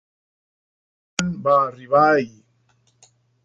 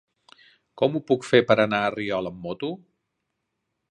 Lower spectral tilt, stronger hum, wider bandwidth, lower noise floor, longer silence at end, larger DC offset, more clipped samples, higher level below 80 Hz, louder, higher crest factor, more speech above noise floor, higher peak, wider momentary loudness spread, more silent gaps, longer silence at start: about the same, -5 dB/octave vs -6 dB/octave; neither; about the same, 10 kHz vs 11 kHz; second, -63 dBFS vs -79 dBFS; about the same, 1.15 s vs 1.15 s; neither; neither; about the same, -60 dBFS vs -64 dBFS; first, -19 LUFS vs -23 LUFS; about the same, 20 dB vs 22 dB; second, 44 dB vs 56 dB; about the same, -2 dBFS vs -2 dBFS; about the same, 12 LU vs 14 LU; neither; first, 1.2 s vs 0.75 s